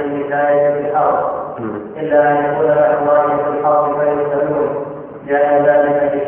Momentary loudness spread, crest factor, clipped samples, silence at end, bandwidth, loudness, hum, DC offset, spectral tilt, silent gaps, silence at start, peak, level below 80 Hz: 11 LU; 14 dB; under 0.1%; 0 s; 3.4 kHz; -15 LUFS; none; under 0.1%; -11 dB/octave; none; 0 s; -2 dBFS; -54 dBFS